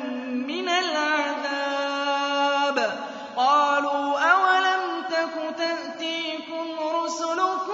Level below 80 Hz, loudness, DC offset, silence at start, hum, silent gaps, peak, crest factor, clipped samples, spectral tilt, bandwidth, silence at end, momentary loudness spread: -80 dBFS; -24 LUFS; under 0.1%; 0 s; none; none; -6 dBFS; 18 dB; under 0.1%; -1.5 dB/octave; 8 kHz; 0 s; 10 LU